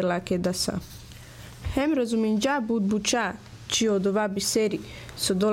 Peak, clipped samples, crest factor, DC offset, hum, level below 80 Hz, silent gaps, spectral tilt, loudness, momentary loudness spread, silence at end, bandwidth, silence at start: -12 dBFS; under 0.1%; 14 dB; under 0.1%; none; -48 dBFS; none; -4 dB/octave; -26 LUFS; 16 LU; 0 s; 17 kHz; 0 s